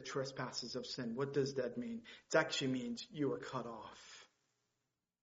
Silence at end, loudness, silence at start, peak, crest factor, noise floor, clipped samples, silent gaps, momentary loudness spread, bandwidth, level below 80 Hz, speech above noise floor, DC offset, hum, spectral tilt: 0.95 s; -40 LUFS; 0 s; -18 dBFS; 24 dB; -89 dBFS; under 0.1%; none; 16 LU; 7.6 kHz; -78 dBFS; 48 dB; under 0.1%; none; -3.5 dB/octave